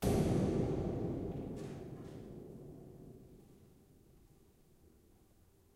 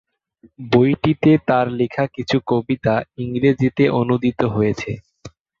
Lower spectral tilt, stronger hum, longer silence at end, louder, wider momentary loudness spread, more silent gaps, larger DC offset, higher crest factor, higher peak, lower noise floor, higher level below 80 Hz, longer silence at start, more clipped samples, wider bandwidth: about the same, -7.5 dB/octave vs -8 dB/octave; neither; first, 2.1 s vs 0.3 s; second, -39 LUFS vs -18 LUFS; first, 23 LU vs 9 LU; neither; neither; about the same, 20 dB vs 16 dB; second, -22 dBFS vs -2 dBFS; first, -67 dBFS vs -43 dBFS; second, -54 dBFS vs -48 dBFS; second, 0 s vs 0.6 s; neither; first, 16 kHz vs 7.4 kHz